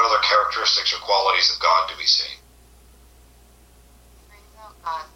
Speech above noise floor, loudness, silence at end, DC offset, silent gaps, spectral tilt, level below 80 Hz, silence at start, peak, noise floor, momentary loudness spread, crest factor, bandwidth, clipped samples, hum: 31 dB; -18 LUFS; 0.1 s; under 0.1%; none; 0.5 dB/octave; -52 dBFS; 0 s; -6 dBFS; -51 dBFS; 15 LU; 16 dB; 16.5 kHz; under 0.1%; none